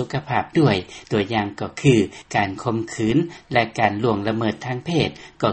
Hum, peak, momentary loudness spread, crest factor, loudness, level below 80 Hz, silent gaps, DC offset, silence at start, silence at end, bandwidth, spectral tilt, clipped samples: none; -2 dBFS; 7 LU; 20 dB; -21 LUFS; -50 dBFS; none; under 0.1%; 0 s; 0 s; 8.8 kHz; -6 dB/octave; under 0.1%